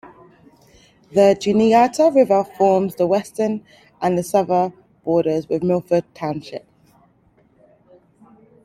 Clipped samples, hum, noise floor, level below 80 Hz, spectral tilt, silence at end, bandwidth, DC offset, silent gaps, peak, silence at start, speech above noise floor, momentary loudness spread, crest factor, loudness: under 0.1%; none; -57 dBFS; -60 dBFS; -6.5 dB/octave; 2.05 s; 15.5 kHz; under 0.1%; none; -2 dBFS; 1.1 s; 40 dB; 13 LU; 18 dB; -18 LUFS